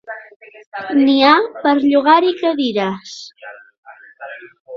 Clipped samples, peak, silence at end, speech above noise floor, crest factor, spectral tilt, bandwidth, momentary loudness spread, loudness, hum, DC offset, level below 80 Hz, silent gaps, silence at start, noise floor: under 0.1%; 0 dBFS; 0 s; 24 dB; 16 dB; -5 dB/octave; 7.2 kHz; 23 LU; -14 LUFS; none; under 0.1%; -64 dBFS; 0.36-0.40 s, 0.66-0.72 s, 3.78-3.83 s, 4.60-4.65 s; 0.1 s; -38 dBFS